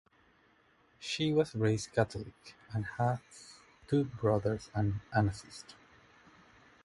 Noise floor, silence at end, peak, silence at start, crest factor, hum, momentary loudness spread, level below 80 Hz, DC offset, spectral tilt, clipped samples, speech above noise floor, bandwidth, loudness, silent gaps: -68 dBFS; 1.1 s; -14 dBFS; 1 s; 22 dB; none; 19 LU; -58 dBFS; under 0.1%; -6 dB/octave; under 0.1%; 34 dB; 11.5 kHz; -33 LUFS; none